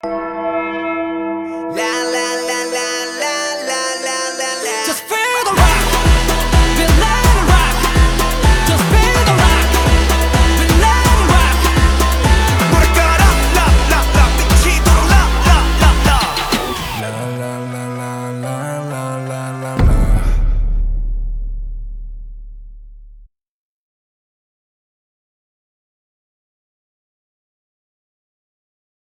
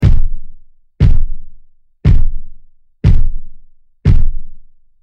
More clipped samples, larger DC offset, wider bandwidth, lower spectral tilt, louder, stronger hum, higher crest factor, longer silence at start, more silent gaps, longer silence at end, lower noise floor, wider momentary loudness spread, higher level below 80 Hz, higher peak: neither; neither; first, 20 kHz vs 3.6 kHz; second, -4.5 dB/octave vs -9 dB/octave; first, -14 LUFS vs -17 LUFS; neither; about the same, 14 dB vs 10 dB; about the same, 0.05 s vs 0 s; neither; first, 6.1 s vs 0.45 s; first, -43 dBFS vs -38 dBFS; second, 12 LU vs 20 LU; about the same, -16 dBFS vs -12 dBFS; about the same, 0 dBFS vs 0 dBFS